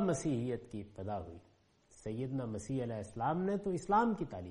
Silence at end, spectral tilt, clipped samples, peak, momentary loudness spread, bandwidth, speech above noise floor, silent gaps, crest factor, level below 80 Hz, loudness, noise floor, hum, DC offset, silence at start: 0 s; -7 dB/octave; under 0.1%; -20 dBFS; 14 LU; 11 kHz; 29 dB; none; 18 dB; -62 dBFS; -37 LUFS; -65 dBFS; none; under 0.1%; 0 s